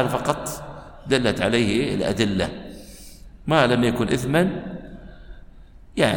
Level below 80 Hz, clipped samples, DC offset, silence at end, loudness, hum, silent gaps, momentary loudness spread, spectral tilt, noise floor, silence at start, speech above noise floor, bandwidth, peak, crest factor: -42 dBFS; under 0.1%; under 0.1%; 0 s; -22 LUFS; none; none; 20 LU; -5.5 dB/octave; -44 dBFS; 0 s; 23 dB; 17.5 kHz; -4 dBFS; 20 dB